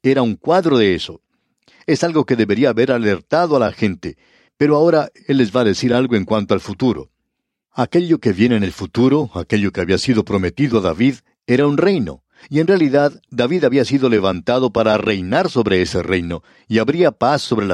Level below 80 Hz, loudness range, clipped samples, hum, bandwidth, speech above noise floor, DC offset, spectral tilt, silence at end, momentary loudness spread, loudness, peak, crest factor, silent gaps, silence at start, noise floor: -48 dBFS; 2 LU; under 0.1%; none; 11.5 kHz; 60 dB; under 0.1%; -6.5 dB/octave; 0 s; 7 LU; -16 LUFS; -2 dBFS; 14 dB; none; 0.05 s; -76 dBFS